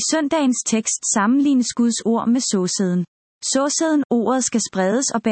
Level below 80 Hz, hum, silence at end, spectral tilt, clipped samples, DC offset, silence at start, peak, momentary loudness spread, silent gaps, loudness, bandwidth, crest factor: -66 dBFS; none; 0 s; -3.5 dB/octave; under 0.1%; under 0.1%; 0 s; -6 dBFS; 4 LU; 3.08-3.41 s, 4.05-4.10 s; -19 LUFS; 8.8 kHz; 14 dB